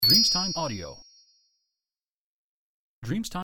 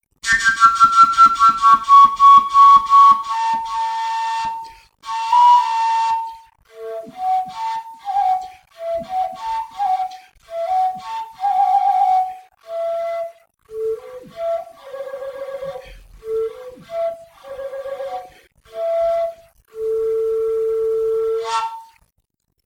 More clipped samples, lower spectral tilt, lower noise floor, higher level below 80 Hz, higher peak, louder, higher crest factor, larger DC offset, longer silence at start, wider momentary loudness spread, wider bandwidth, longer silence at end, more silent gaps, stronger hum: neither; first, -3 dB/octave vs -1.5 dB/octave; first, under -90 dBFS vs -70 dBFS; about the same, -52 dBFS vs -54 dBFS; second, -8 dBFS vs -2 dBFS; second, -23 LUFS vs -16 LUFS; first, 22 dB vs 16 dB; neither; second, 0 s vs 0.25 s; about the same, 23 LU vs 22 LU; about the same, 17 kHz vs 15.5 kHz; second, 0 s vs 0.85 s; first, 2.11-3.02 s vs none; neither